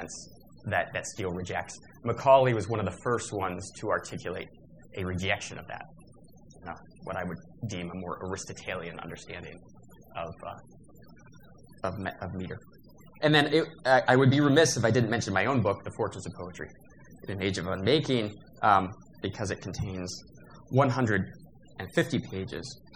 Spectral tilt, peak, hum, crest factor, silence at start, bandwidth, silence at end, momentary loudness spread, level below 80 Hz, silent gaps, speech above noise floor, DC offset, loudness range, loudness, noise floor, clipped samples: -5 dB/octave; -6 dBFS; none; 24 dB; 0 s; 16 kHz; 0 s; 21 LU; -58 dBFS; none; 25 dB; 0.1%; 15 LU; -29 LUFS; -54 dBFS; under 0.1%